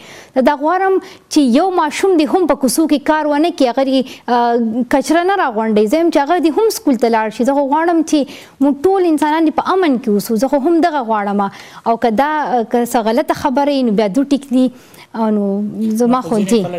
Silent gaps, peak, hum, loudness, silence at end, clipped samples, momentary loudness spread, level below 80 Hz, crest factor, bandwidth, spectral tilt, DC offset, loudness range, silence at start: none; -2 dBFS; none; -14 LUFS; 0 s; under 0.1%; 4 LU; -50 dBFS; 12 dB; 16 kHz; -5 dB/octave; under 0.1%; 2 LU; 0 s